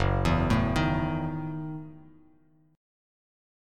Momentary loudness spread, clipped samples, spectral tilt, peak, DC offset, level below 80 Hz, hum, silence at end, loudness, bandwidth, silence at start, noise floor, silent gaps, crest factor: 14 LU; under 0.1%; -7 dB/octave; -12 dBFS; under 0.1%; -40 dBFS; none; 1.65 s; -28 LUFS; 13 kHz; 0 s; -62 dBFS; none; 18 dB